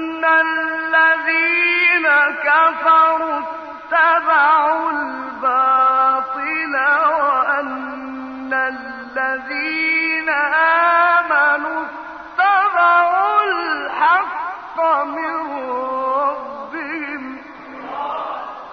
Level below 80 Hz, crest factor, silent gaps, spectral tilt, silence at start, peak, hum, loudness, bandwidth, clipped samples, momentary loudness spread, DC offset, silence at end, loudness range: -60 dBFS; 14 dB; none; -4 dB/octave; 0 s; -4 dBFS; none; -16 LUFS; 6.4 kHz; under 0.1%; 14 LU; under 0.1%; 0 s; 7 LU